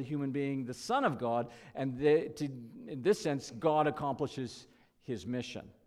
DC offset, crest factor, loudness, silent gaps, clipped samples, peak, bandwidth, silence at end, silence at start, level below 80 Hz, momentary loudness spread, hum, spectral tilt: under 0.1%; 16 dB; -34 LUFS; none; under 0.1%; -18 dBFS; 13.5 kHz; 0.15 s; 0 s; -68 dBFS; 14 LU; none; -6 dB/octave